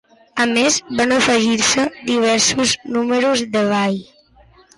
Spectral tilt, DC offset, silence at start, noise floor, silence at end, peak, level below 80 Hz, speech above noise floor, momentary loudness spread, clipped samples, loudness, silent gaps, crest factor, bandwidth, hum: -2.5 dB/octave; under 0.1%; 0.35 s; -50 dBFS; 0.75 s; -4 dBFS; -52 dBFS; 33 dB; 5 LU; under 0.1%; -16 LUFS; none; 14 dB; 11.5 kHz; none